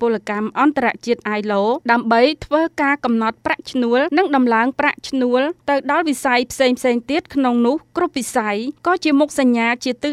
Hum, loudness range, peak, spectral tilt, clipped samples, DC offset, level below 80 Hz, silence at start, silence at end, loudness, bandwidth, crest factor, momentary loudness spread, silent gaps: none; 1 LU; 0 dBFS; -4 dB/octave; under 0.1%; under 0.1%; -54 dBFS; 0 s; 0 s; -18 LUFS; 14 kHz; 16 dB; 5 LU; none